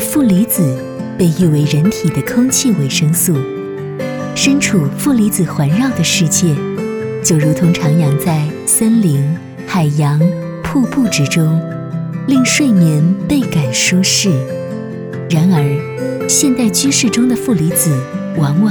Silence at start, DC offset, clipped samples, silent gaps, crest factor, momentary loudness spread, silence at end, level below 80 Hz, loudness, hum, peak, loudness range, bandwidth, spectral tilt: 0 s; under 0.1%; under 0.1%; none; 12 dB; 10 LU; 0 s; -46 dBFS; -13 LUFS; none; 0 dBFS; 1 LU; over 20 kHz; -5 dB/octave